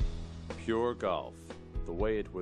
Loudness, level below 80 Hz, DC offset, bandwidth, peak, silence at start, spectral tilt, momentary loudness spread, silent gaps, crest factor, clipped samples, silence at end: -35 LUFS; -40 dBFS; under 0.1%; 10.5 kHz; -18 dBFS; 0 s; -7 dB/octave; 12 LU; none; 16 dB; under 0.1%; 0 s